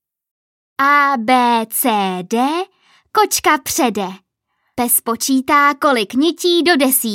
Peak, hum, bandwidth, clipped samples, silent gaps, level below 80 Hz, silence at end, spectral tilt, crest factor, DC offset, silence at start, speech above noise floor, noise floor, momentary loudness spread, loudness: 0 dBFS; none; 17 kHz; under 0.1%; none; -58 dBFS; 0 s; -2.5 dB/octave; 16 dB; under 0.1%; 0.8 s; 54 dB; -69 dBFS; 10 LU; -15 LUFS